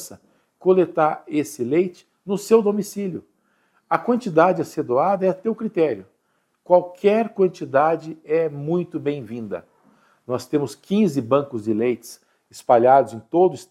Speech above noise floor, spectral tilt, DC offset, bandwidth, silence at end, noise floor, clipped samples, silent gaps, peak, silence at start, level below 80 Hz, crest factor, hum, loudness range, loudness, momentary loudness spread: 49 dB; -6.5 dB/octave; under 0.1%; 14.5 kHz; 0.05 s; -69 dBFS; under 0.1%; none; 0 dBFS; 0 s; -70 dBFS; 20 dB; none; 4 LU; -21 LUFS; 13 LU